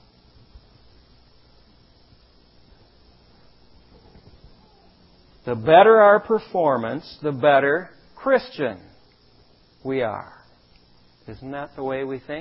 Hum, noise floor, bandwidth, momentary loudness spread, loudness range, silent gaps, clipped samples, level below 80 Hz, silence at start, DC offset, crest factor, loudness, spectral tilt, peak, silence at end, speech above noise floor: none; -55 dBFS; 5.8 kHz; 23 LU; 14 LU; none; under 0.1%; -58 dBFS; 5.45 s; under 0.1%; 22 dB; -19 LUFS; -10 dB/octave; 0 dBFS; 0 s; 36 dB